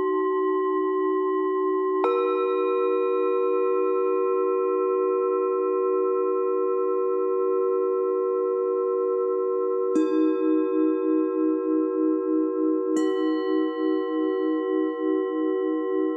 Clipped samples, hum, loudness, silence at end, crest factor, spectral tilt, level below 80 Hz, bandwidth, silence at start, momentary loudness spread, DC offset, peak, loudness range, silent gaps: under 0.1%; none; -24 LUFS; 0 s; 12 dB; -5 dB/octave; -88 dBFS; 8 kHz; 0 s; 2 LU; under 0.1%; -12 dBFS; 1 LU; none